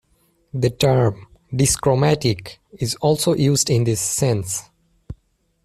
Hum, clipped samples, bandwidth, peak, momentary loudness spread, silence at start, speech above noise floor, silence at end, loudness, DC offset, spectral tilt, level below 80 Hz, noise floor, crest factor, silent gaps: none; under 0.1%; 15 kHz; -4 dBFS; 12 LU; 0.55 s; 44 dB; 0.5 s; -19 LUFS; under 0.1%; -5 dB/octave; -46 dBFS; -63 dBFS; 16 dB; none